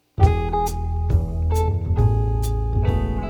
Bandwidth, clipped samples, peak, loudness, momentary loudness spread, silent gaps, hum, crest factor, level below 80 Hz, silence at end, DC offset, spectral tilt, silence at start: 18.5 kHz; under 0.1%; -2 dBFS; -22 LUFS; 5 LU; none; none; 18 dB; -24 dBFS; 0 s; under 0.1%; -7.5 dB/octave; 0.2 s